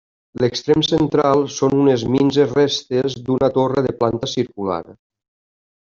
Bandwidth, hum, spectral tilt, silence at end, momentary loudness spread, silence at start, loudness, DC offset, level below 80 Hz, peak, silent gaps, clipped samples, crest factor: 7.4 kHz; none; -6 dB/octave; 0.95 s; 7 LU; 0.35 s; -18 LUFS; under 0.1%; -50 dBFS; -2 dBFS; none; under 0.1%; 16 dB